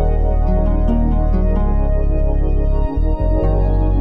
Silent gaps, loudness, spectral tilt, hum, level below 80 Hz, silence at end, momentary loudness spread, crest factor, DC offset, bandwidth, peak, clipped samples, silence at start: none; -18 LUFS; -11.5 dB/octave; none; -14 dBFS; 0 s; 2 LU; 8 dB; 0.7%; 3 kHz; -6 dBFS; under 0.1%; 0 s